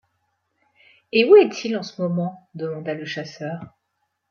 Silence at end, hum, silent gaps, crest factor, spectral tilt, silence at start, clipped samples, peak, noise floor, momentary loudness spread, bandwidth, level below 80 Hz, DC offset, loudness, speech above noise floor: 0.6 s; none; none; 20 dB; -6 dB/octave; 1.15 s; under 0.1%; -2 dBFS; -75 dBFS; 18 LU; 6.8 kHz; -72 dBFS; under 0.1%; -20 LUFS; 54 dB